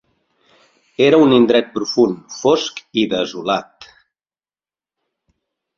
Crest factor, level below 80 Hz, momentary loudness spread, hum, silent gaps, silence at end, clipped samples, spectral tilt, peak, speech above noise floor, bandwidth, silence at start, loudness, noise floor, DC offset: 18 dB; -60 dBFS; 10 LU; none; none; 2.15 s; under 0.1%; -5 dB/octave; -2 dBFS; over 75 dB; 7.4 kHz; 1 s; -16 LUFS; under -90 dBFS; under 0.1%